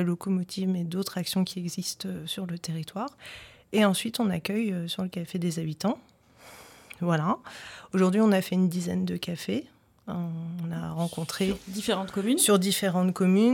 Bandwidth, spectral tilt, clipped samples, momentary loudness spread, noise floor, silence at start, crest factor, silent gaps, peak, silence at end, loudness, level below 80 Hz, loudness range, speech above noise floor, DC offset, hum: 17.5 kHz; -5 dB/octave; under 0.1%; 13 LU; -52 dBFS; 0 s; 18 dB; none; -10 dBFS; 0 s; -28 LUFS; -62 dBFS; 5 LU; 25 dB; under 0.1%; none